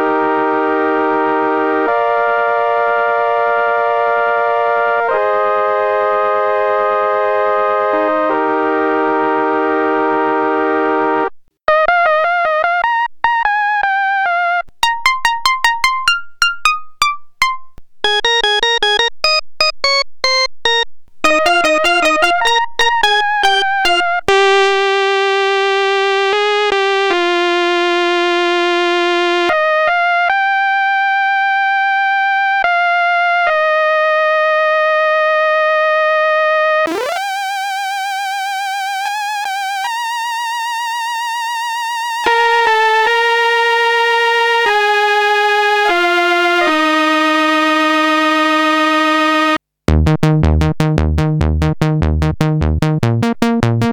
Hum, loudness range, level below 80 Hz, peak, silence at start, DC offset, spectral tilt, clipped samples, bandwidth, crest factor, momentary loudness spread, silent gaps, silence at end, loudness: none; 3 LU; -32 dBFS; 0 dBFS; 0 s; 0.2%; -4.5 dB/octave; under 0.1%; over 20 kHz; 14 dB; 7 LU; none; 0 s; -13 LUFS